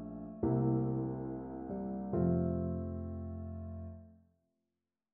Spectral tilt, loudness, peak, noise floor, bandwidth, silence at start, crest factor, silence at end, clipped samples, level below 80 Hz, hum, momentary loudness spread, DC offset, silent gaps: -14 dB/octave; -37 LUFS; -20 dBFS; -90 dBFS; 2.1 kHz; 0 s; 18 dB; 1 s; under 0.1%; -54 dBFS; none; 14 LU; under 0.1%; none